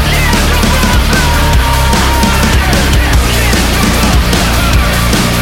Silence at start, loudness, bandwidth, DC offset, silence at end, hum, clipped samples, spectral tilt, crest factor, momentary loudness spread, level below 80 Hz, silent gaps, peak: 0 s; -9 LUFS; 17 kHz; under 0.1%; 0 s; none; under 0.1%; -4 dB/octave; 8 dB; 1 LU; -12 dBFS; none; 0 dBFS